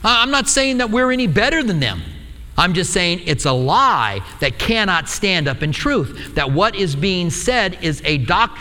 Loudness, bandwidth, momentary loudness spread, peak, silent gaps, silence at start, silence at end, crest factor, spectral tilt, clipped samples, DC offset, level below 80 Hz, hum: -17 LUFS; 18 kHz; 7 LU; 0 dBFS; none; 0 s; 0 s; 18 dB; -4 dB/octave; under 0.1%; under 0.1%; -34 dBFS; none